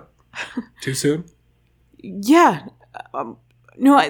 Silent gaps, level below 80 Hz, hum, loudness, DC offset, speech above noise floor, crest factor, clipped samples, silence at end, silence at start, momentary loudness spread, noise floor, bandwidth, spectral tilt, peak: none; -60 dBFS; none; -19 LUFS; under 0.1%; 42 dB; 18 dB; under 0.1%; 0 s; 0.35 s; 23 LU; -59 dBFS; 20 kHz; -5 dB/octave; -2 dBFS